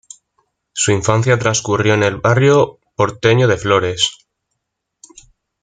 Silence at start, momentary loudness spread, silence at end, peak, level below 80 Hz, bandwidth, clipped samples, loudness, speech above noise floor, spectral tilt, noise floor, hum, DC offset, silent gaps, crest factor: 0.75 s; 6 LU; 1.5 s; 0 dBFS; -48 dBFS; 9.6 kHz; under 0.1%; -15 LUFS; 62 dB; -4.5 dB/octave; -76 dBFS; none; under 0.1%; none; 16 dB